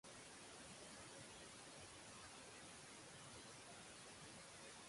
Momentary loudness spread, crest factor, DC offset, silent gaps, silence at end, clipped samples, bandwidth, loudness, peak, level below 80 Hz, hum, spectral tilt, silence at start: 1 LU; 14 dB; under 0.1%; none; 0 s; under 0.1%; 11.5 kHz; -58 LUFS; -46 dBFS; -78 dBFS; none; -2 dB/octave; 0.05 s